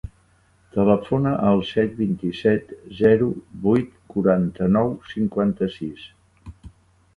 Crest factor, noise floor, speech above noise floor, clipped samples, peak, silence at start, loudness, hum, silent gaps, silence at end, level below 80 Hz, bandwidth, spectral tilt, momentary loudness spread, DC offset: 20 dB; -59 dBFS; 38 dB; under 0.1%; -2 dBFS; 0.05 s; -21 LUFS; none; none; 0.5 s; -48 dBFS; 6.2 kHz; -9 dB/octave; 11 LU; under 0.1%